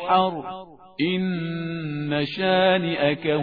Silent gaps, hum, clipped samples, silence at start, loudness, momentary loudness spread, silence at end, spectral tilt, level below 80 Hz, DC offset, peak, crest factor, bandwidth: none; none; under 0.1%; 0 s; -23 LUFS; 14 LU; 0 s; -8.5 dB/octave; -60 dBFS; 0.1%; -6 dBFS; 18 dB; 5 kHz